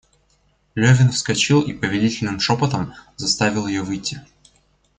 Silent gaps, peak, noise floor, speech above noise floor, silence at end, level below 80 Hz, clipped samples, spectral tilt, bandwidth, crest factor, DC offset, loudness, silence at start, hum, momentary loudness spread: none; -2 dBFS; -62 dBFS; 43 dB; 0.75 s; -50 dBFS; under 0.1%; -4.5 dB/octave; 9.4 kHz; 18 dB; under 0.1%; -19 LUFS; 0.75 s; none; 12 LU